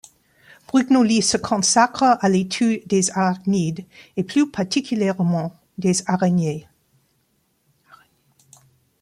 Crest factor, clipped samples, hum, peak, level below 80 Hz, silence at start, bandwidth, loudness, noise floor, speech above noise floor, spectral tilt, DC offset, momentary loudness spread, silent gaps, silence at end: 18 dB; under 0.1%; none; -2 dBFS; -60 dBFS; 0.75 s; 12.5 kHz; -19 LUFS; -66 dBFS; 47 dB; -4.5 dB/octave; under 0.1%; 10 LU; none; 2.4 s